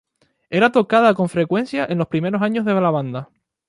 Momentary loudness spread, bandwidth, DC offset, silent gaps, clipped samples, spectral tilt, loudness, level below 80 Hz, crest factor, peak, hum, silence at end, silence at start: 9 LU; 11.5 kHz; under 0.1%; none; under 0.1%; -7.5 dB/octave; -18 LUFS; -60 dBFS; 18 dB; -2 dBFS; none; 0.45 s; 0.5 s